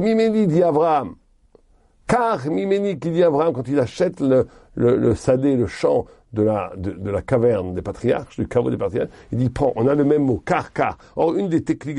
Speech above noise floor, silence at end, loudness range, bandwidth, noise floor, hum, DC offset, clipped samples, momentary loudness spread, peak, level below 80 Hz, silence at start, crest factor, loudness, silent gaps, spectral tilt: 37 dB; 0 s; 3 LU; 11 kHz; -56 dBFS; none; under 0.1%; under 0.1%; 7 LU; -6 dBFS; -46 dBFS; 0 s; 14 dB; -20 LUFS; none; -8 dB/octave